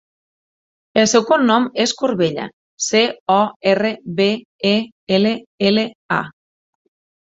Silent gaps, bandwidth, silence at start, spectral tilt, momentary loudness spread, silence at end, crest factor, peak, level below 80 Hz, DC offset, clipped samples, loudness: 2.53-2.78 s, 3.20-3.26 s, 3.56-3.60 s, 4.45-4.59 s, 4.92-5.07 s, 5.46-5.58 s, 5.95-6.09 s; 8 kHz; 0.95 s; -4 dB/octave; 8 LU; 0.9 s; 16 dB; -2 dBFS; -60 dBFS; under 0.1%; under 0.1%; -17 LUFS